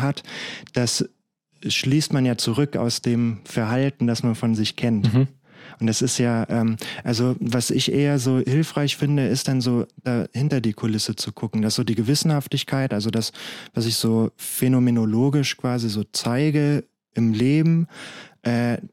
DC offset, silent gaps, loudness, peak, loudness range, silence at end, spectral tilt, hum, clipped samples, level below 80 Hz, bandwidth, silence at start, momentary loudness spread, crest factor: under 0.1%; none; -22 LUFS; -6 dBFS; 2 LU; 0.05 s; -5.5 dB/octave; none; under 0.1%; -60 dBFS; 16.5 kHz; 0 s; 7 LU; 16 dB